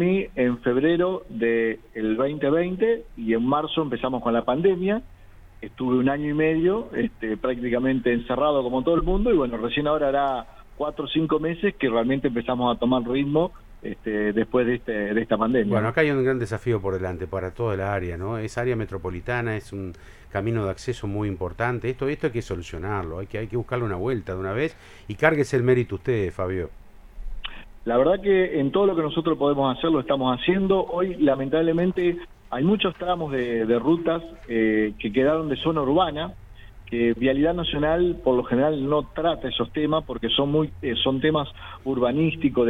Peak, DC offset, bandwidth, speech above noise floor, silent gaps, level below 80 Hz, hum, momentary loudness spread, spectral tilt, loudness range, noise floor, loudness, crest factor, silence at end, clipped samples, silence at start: -2 dBFS; under 0.1%; 11 kHz; 20 dB; none; -42 dBFS; none; 9 LU; -7.5 dB/octave; 5 LU; -43 dBFS; -24 LUFS; 20 dB; 0 s; under 0.1%; 0 s